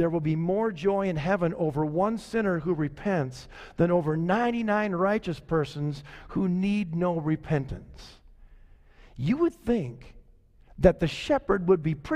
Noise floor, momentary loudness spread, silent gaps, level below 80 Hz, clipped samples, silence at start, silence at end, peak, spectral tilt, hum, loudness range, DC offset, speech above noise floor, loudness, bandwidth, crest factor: -56 dBFS; 9 LU; none; -46 dBFS; under 0.1%; 0 s; 0 s; -6 dBFS; -8 dB/octave; none; 4 LU; under 0.1%; 30 dB; -27 LUFS; 11 kHz; 22 dB